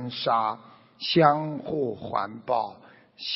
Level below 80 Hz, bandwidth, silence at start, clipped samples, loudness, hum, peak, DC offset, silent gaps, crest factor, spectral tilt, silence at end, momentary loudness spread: -68 dBFS; 6 kHz; 0 s; under 0.1%; -26 LUFS; none; -4 dBFS; under 0.1%; none; 24 dB; -3.5 dB/octave; 0 s; 14 LU